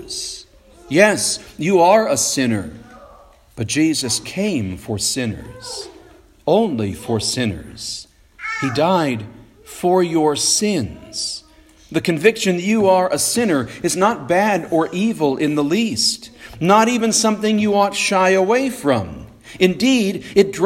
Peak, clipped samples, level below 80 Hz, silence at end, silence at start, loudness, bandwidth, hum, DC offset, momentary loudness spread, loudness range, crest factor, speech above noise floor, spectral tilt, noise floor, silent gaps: 0 dBFS; under 0.1%; -50 dBFS; 0 s; 0 s; -17 LUFS; 16.5 kHz; none; under 0.1%; 14 LU; 5 LU; 18 dB; 29 dB; -4 dB/octave; -46 dBFS; none